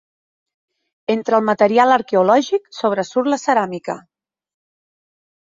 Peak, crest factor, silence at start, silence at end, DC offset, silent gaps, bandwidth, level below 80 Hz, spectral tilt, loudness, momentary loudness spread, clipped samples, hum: -2 dBFS; 18 dB; 1.1 s; 1.6 s; under 0.1%; none; 7.8 kHz; -68 dBFS; -5 dB/octave; -17 LUFS; 13 LU; under 0.1%; none